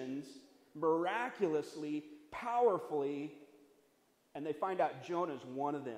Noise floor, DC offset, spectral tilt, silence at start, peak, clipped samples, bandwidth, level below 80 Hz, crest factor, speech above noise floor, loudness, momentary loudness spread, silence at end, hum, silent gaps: -73 dBFS; under 0.1%; -6 dB/octave; 0 s; -20 dBFS; under 0.1%; 14 kHz; -82 dBFS; 18 dB; 36 dB; -37 LUFS; 14 LU; 0 s; none; none